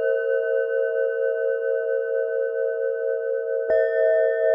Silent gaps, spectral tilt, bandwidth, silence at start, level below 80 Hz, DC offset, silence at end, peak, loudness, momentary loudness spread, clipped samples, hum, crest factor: none; -5.5 dB/octave; 3.5 kHz; 0 s; -72 dBFS; under 0.1%; 0 s; -10 dBFS; -23 LUFS; 5 LU; under 0.1%; none; 12 dB